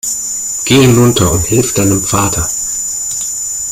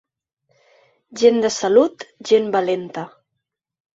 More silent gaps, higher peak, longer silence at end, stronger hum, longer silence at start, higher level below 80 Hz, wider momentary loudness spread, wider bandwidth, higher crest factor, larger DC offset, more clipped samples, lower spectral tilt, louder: neither; about the same, 0 dBFS vs -2 dBFS; second, 0 s vs 0.9 s; neither; second, 0.05 s vs 1.1 s; first, -34 dBFS vs -66 dBFS; second, 8 LU vs 18 LU; first, 16.5 kHz vs 8 kHz; second, 12 dB vs 18 dB; neither; neither; about the same, -4 dB/octave vs -4 dB/octave; first, -11 LUFS vs -18 LUFS